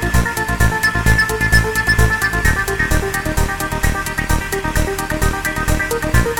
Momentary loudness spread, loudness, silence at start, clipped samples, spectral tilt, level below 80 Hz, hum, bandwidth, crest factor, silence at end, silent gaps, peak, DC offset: 5 LU; -17 LUFS; 0 s; under 0.1%; -4.5 dB/octave; -22 dBFS; none; 19 kHz; 16 dB; 0 s; none; -2 dBFS; 2%